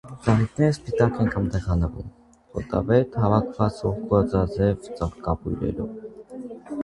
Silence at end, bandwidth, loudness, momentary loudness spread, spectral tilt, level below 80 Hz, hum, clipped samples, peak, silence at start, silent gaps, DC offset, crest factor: 0 s; 11 kHz; -24 LUFS; 16 LU; -8.5 dB/octave; -38 dBFS; none; under 0.1%; -4 dBFS; 0.05 s; none; under 0.1%; 20 dB